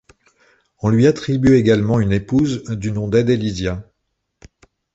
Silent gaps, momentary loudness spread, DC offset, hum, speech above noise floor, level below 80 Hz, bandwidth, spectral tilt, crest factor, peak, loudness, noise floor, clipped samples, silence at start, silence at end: none; 10 LU; under 0.1%; none; 57 dB; -40 dBFS; 8 kHz; -7.5 dB/octave; 16 dB; -2 dBFS; -17 LUFS; -73 dBFS; under 0.1%; 0.85 s; 1.1 s